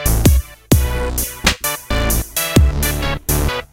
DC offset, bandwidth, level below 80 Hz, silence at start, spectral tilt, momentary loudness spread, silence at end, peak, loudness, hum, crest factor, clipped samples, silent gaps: under 0.1%; 17.5 kHz; -20 dBFS; 0 s; -4 dB/octave; 6 LU; 0.05 s; 0 dBFS; -17 LUFS; none; 16 dB; under 0.1%; none